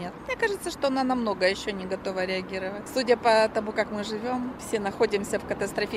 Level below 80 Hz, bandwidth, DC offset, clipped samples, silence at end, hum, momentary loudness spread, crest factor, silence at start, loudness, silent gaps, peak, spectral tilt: -54 dBFS; 16 kHz; under 0.1%; under 0.1%; 0 s; none; 9 LU; 18 dB; 0 s; -27 LUFS; none; -8 dBFS; -4 dB/octave